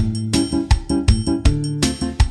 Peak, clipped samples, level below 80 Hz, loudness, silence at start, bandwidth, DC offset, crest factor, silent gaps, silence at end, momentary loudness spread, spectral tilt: -2 dBFS; under 0.1%; -22 dBFS; -19 LUFS; 0 s; 13 kHz; under 0.1%; 14 dB; none; 0 s; 3 LU; -5.5 dB/octave